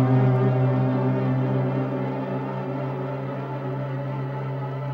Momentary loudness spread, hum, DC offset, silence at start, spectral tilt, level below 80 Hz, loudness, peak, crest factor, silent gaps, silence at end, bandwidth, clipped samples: 9 LU; none; under 0.1%; 0 s; -10.5 dB/octave; -58 dBFS; -25 LUFS; -10 dBFS; 14 dB; none; 0 s; 4.7 kHz; under 0.1%